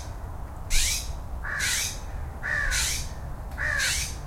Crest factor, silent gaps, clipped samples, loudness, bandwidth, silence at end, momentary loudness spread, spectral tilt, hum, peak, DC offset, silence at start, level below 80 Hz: 20 dB; none; under 0.1%; -27 LUFS; 16.5 kHz; 0 s; 14 LU; -1 dB/octave; none; -10 dBFS; under 0.1%; 0 s; -34 dBFS